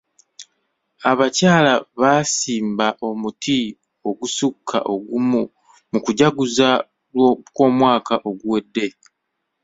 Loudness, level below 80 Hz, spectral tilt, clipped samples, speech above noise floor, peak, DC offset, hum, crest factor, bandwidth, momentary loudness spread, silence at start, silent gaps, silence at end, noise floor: -19 LUFS; -60 dBFS; -4.5 dB/octave; under 0.1%; 58 dB; -2 dBFS; under 0.1%; none; 18 dB; 8 kHz; 11 LU; 0.4 s; none; 0.75 s; -76 dBFS